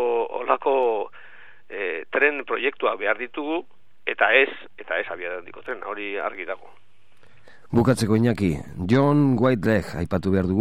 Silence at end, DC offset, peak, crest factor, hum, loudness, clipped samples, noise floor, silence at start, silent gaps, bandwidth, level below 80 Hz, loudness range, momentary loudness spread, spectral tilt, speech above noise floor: 0 s; 0.9%; -2 dBFS; 22 dB; none; -23 LUFS; under 0.1%; -59 dBFS; 0 s; none; 15 kHz; -52 dBFS; 5 LU; 14 LU; -6.5 dB/octave; 36 dB